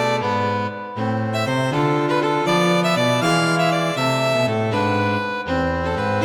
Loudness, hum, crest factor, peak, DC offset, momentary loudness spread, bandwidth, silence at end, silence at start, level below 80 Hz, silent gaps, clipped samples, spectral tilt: -20 LUFS; none; 14 dB; -6 dBFS; under 0.1%; 5 LU; 17 kHz; 0 s; 0 s; -46 dBFS; none; under 0.1%; -5.5 dB/octave